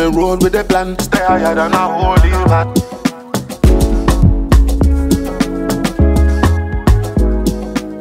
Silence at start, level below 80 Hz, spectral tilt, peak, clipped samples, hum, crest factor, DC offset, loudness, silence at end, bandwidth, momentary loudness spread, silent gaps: 0 s; -16 dBFS; -6.5 dB/octave; 0 dBFS; under 0.1%; none; 12 dB; under 0.1%; -14 LUFS; 0 s; 16 kHz; 6 LU; none